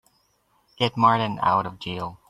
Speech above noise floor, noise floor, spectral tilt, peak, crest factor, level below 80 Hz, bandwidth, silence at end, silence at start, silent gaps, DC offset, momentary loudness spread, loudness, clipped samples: 43 dB; -66 dBFS; -6.5 dB/octave; -4 dBFS; 20 dB; -60 dBFS; 12.5 kHz; 0.15 s; 0.8 s; none; under 0.1%; 12 LU; -23 LUFS; under 0.1%